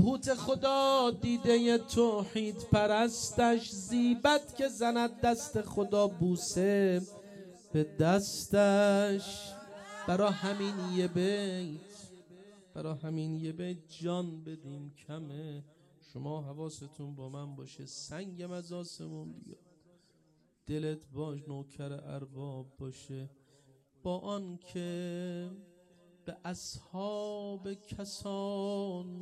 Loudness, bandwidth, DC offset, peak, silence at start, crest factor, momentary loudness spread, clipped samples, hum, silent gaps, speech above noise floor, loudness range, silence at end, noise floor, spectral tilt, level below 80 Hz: -33 LUFS; 14.5 kHz; under 0.1%; -14 dBFS; 0 s; 20 dB; 18 LU; under 0.1%; none; none; 37 dB; 15 LU; 0 s; -70 dBFS; -5 dB/octave; -62 dBFS